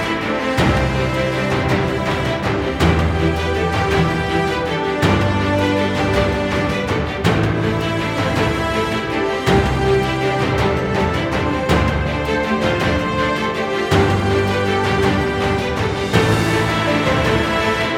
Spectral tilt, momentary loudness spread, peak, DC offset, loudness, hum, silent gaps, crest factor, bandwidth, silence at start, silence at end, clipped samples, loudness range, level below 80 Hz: -6 dB/octave; 4 LU; -2 dBFS; under 0.1%; -18 LUFS; none; none; 16 dB; 16.5 kHz; 0 s; 0 s; under 0.1%; 1 LU; -30 dBFS